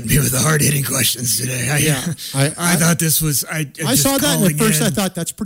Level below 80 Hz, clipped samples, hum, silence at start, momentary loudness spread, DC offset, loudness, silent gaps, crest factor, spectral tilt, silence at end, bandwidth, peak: -40 dBFS; under 0.1%; none; 0 s; 6 LU; under 0.1%; -16 LUFS; none; 12 dB; -3.5 dB/octave; 0 s; 16.5 kHz; -4 dBFS